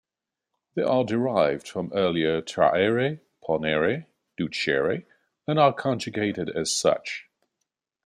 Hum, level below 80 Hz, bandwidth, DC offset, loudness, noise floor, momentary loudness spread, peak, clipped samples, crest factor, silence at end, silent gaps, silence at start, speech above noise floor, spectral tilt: none; -64 dBFS; 14.5 kHz; under 0.1%; -25 LUFS; -87 dBFS; 12 LU; -6 dBFS; under 0.1%; 20 dB; 0.85 s; none; 0.75 s; 63 dB; -4.5 dB/octave